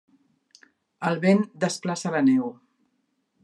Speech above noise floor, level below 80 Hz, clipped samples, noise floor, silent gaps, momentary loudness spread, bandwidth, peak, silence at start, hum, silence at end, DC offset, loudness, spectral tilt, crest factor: 50 dB; -76 dBFS; under 0.1%; -73 dBFS; none; 8 LU; 11.5 kHz; -8 dBFS; 1 s; none; 0.9 s; under 0.1%; -24 LUFS; -6 dB/octave; 18 dB